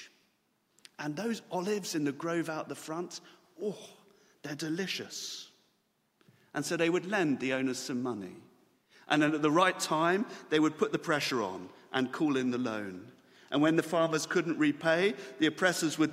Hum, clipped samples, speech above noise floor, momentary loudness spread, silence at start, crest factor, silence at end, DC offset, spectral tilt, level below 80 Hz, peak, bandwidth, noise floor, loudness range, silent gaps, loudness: none; under 0.1%; 44 dB; 13 LU; 0 s; 22 dB; 0 s; under 0.1%; -4.5 dB/octave; -78 dBFS; -10 dBFS; 16 kHz; -75 dBFS; 9 LU; none; -31 LUFS